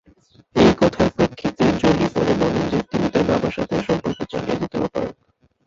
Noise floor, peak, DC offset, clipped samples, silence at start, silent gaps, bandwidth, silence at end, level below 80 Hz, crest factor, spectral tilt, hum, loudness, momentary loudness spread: -62 dBFS; -2 dBFS; under 0.1%; under 0.1%; 0.55 s; none; 7.8 kHz; 0.55 s; -42 dBFS; 18 dB; -6.5 dB/octave; none; -20 LUFS; 9 LU